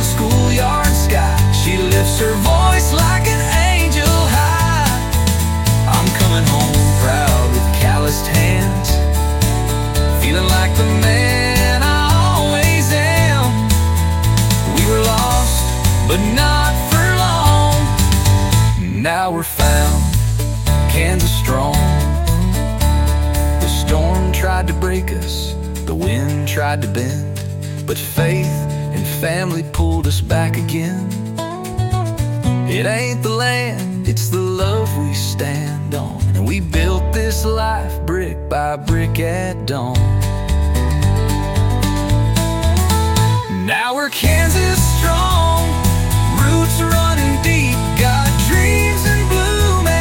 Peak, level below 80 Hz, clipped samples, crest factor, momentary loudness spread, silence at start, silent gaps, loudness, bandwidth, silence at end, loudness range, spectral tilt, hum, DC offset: -2 dBFS; -20 dBFS; under 0.1%; 12 dB; 7 LU; 0 s; none; -15 LUFS; 17 kHz; 0 s; 5 LU; -5 dB/octave; none; under 0.1%